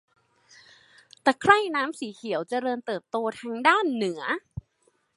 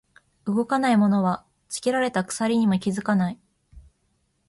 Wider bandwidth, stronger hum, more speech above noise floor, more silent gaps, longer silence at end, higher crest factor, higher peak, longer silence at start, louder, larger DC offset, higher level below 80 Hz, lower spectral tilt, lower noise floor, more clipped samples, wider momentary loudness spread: about the same, 11.5 kHz vs 11.5 kHz; neither; second, 43 dB vs 48 dB; neither; second, 0.55 s vs 0.7 s; first, 26 dB vs 14 dB; first, -2 dBFS vs -10 dBFS; first, 1.25 s vs 0.45 s; about the same, -25 LUFS vs -23 LUFS; neither; about the same, -60 dBFS vs -58 dBFS; second, -4.5 dB/octave vs -6 dB/octave; about the same, -69 dBFS vs -70 dBFS; neither; about the same, 12 LU vs 13 LU